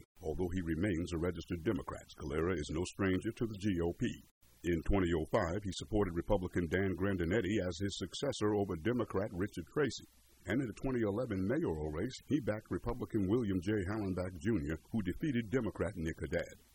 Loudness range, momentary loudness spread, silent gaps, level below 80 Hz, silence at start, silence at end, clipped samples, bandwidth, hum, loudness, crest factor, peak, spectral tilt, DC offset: 2 LU; 6 LU; 4.31-4.41 s; -50 dBFS; 0.15 s; 0.15 s; under 0.1%; over 20 kHz; none; -37 LUFS; 18 dB; -18 dBFS; -6.5 dB/octave; under 0.1%